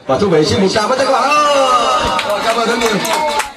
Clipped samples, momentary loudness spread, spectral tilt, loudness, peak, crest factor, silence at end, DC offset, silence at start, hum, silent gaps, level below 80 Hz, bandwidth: under 0.1%; 4 LU; -3.5 dB/octave; -13 LUFS; 0 dBFS; 14 dB; 0 s; under 0.1%; 0.05 s; none; none; -42 dBFS; 14.5 kHz